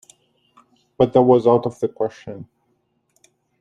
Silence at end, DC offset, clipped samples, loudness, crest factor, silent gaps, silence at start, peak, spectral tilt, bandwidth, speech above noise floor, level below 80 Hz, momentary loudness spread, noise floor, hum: 1.2 s; under 0.1%; under 0.1%; -18 LUFS; 20 dB; none; 1 s; -2 dBFS; -8.5 dB/octave; 10 kHz; 50 dB; -60 dBFS; 22 LU; -68 dBFS; none